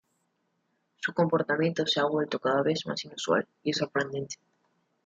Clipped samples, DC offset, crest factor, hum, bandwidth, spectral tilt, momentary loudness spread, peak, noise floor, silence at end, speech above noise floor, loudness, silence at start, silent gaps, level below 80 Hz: under 0.1%; under 0.1%; 20 dB; none; 9 kHz; -4.5 dB/octave; 9 LU; -10 dBFS; -76 dBFS; 0.7 s; 47 dB; -28 LUFS; 1 s; none; -72 dBFS